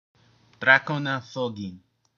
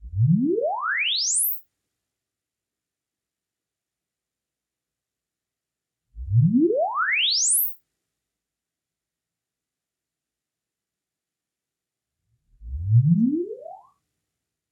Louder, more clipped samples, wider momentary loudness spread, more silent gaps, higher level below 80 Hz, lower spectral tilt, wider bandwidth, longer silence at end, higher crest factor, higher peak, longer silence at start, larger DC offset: about the same, -23 LUFS vs -21 LUFS; neither; about the same, 17 LU vs 15 LU; neither; second, -74 dBFS vs -48 dBFS; first, -5.5 dB/octave vs -4 dB/octave; second, 7.2 kHz vs 14.5 kHz; second, 0.4 s vs 0.95 s; first, 24 dB vs 18 dB; first, -2 dBFS vs -10 dBFS; first, 0.6 s vs 0 s; neither